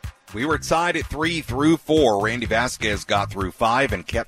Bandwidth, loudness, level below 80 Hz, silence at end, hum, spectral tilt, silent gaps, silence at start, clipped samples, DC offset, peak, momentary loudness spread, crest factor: 15.5 kHz; -21 LUFS; -38 dBFS; 0.05 s; none; -4.5 dB/octave; none; 0.05 s; under 0.1%; under 0.1%; -4 dBFS; 6 LU; 18 dB